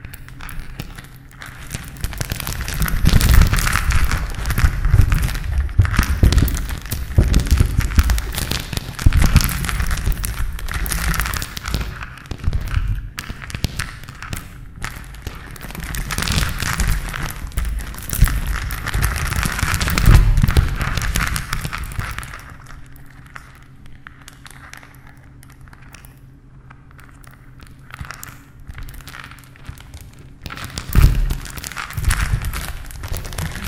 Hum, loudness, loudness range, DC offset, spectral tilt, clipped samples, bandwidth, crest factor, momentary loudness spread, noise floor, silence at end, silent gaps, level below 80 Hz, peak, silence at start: none; -21 LUFS; 21 LU; under 0.1%; -4.5 dB/octave; under 0.1%; 18 kHz; 20 dB; 22 LU; -42 dBFS; 0 s; none; -22 dBFS; 0 dBFS; 0 s